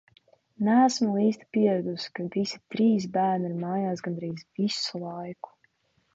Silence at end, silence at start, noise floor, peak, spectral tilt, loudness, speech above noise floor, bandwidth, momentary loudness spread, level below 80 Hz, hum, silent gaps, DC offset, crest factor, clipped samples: 0.8 s; 0.6 s; -69 dBFS; -10 dBFS; -5.5 dB/octave; -27 LUFS; 42 dB; 8 kHz; 14 LU; -74 dBFS; none; none; under 0.1%; 18 dB; under 0.1%